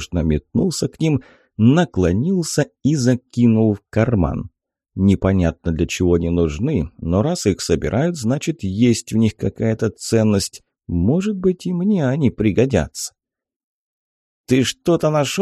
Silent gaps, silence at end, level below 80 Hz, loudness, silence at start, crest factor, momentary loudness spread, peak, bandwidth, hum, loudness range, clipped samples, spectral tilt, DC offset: 13.56-14.44 s; 0 s; -36 dBFS; -19 LUFS; 0 s; 16 dB; 6 LU; -2 dBFS; 13 kHz; none; 3 LU; under 0.1%; -6 dB/octave; under 0.1%